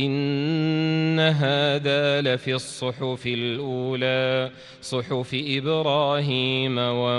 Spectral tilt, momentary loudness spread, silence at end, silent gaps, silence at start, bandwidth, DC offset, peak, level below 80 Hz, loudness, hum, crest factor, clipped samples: -6 dB/octave; 7 LU; 0 s; none; 0 s; 11.5 kHz; under 0.1%; -8 dBFS; -64 dBFS; -23 LUFS; none; 16 dB; under 0.1%